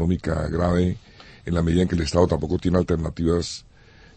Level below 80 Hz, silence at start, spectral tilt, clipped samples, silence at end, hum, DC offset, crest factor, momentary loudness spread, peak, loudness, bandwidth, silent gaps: -36 dBFS; 0 s; -7 dB/octave; under 0.1%; 0.55 s; none; under 0.1%; 18 dB; 10 LU; -6 dBFS; -23 LUFS; 8.8 kHz; none